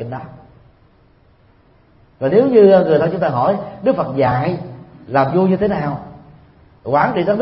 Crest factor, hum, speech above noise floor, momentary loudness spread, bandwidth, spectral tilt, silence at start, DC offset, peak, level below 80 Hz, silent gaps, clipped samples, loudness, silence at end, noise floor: 16 dB; none; 37 dB; 18 LU; 5.8 kHz; -12.5 dB/octave; 0 s; under 0.1%; 0 dBFS; -50 dBFS; none; under 0.1%; -15 LUFS; 0 s; -51 dBFS